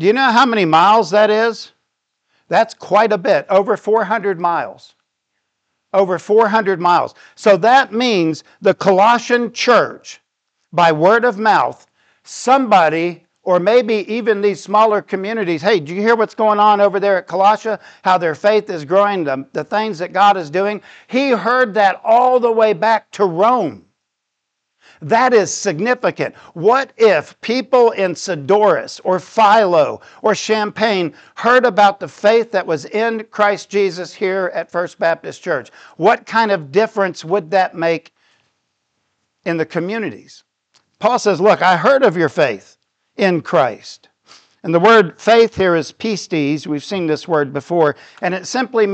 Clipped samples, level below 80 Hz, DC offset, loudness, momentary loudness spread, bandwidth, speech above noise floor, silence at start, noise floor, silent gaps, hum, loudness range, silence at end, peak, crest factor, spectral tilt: under 0.1%; -64 dBFS; under 0.1%; -15 LUFS; 10 LU; 8.8 kHz; 61 dB; 0 s; -76 dBFS; none; none; 4 LU; 0 s; 0 dBFS; 14 dB; -5 dB/octave